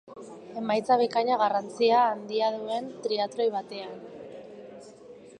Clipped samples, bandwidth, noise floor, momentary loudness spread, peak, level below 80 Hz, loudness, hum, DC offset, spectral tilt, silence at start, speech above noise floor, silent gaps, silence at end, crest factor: under 0.1%; 10 kHz; -49 dBFS; 21 LU; -10 dBFS; -76 dBFS; -26 LUFS; none; under 0.1%; -4.5 dB/octave; 0.05 s; 22 dB; none; 0.05 s; 18 dB